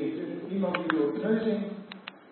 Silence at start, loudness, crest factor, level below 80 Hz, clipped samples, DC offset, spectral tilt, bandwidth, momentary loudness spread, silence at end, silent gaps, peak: 0 s; -30 LUFS; 22 dB; -76 dBFS; under 0.1%; under 0.1%; -10.5 dB/octave; 4.4 kHz; 14 LU; 0 s; none; -8 dBFS